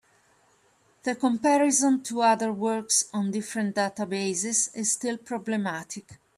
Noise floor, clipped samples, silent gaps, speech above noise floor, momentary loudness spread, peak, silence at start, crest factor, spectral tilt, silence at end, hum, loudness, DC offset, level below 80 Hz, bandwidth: -64 dBFS; under 0.1%; none; 38 dB; 10 LU; -10 dBFS; 1.05 s; 18 dB; -3 dB/octave; 0.2 s; none; -26 LUFS; under 0.1%; -74 dBFS; 15 kHz